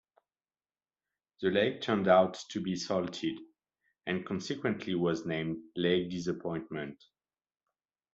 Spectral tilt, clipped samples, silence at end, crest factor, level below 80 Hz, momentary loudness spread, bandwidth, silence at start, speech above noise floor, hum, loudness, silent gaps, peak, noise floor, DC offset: -5.5 dB/octave; under 0.1%; 1.2 s; 22 dB; -70 dBFS; 12 LU; 8 kHz; 1.4 s; over 58 dB; none; -32 LUFS; none; -10 dBFS; under -90 dBFS; under 0.1%